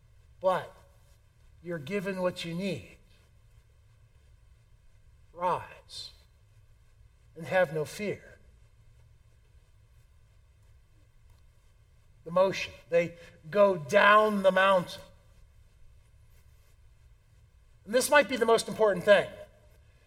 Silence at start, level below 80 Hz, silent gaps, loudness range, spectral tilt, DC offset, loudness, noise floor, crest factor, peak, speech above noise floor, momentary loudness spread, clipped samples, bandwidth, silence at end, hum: 0.45 s; -60 dBFS; none; 14 LU; -4 dB/octave; under 0.1%; -27 LUFS; -60 dBFS; 24 dB; -8 dBFS; 33 dB; 20 LU; under 0.1%; 16 kHz; 0.6 s; none